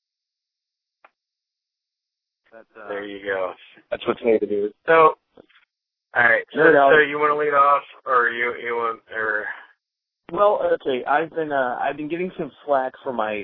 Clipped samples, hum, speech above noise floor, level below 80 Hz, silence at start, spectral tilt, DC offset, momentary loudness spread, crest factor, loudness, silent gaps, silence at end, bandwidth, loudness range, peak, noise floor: under 0.1%; none; 64 dB; -64 dBFS; 2.55 s; -8.5 dB/octave; under 0.1%; 15 LU; 22 dB; -20 LUFS; none; 0 s; 4.2 kHz; 14 LU; 0 dBFS; -84 dBFS